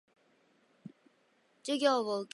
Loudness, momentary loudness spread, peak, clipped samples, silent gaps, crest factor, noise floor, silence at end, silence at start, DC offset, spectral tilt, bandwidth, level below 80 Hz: -31 LUFS; 26 LU; -14 dBFS; under 0.1%; none; 22 dB; -71 dBFS; 0.1 s; 0.85 s; under 0.1%; -3.5 dB/octave; 11.5 kHz; under -90 dBFS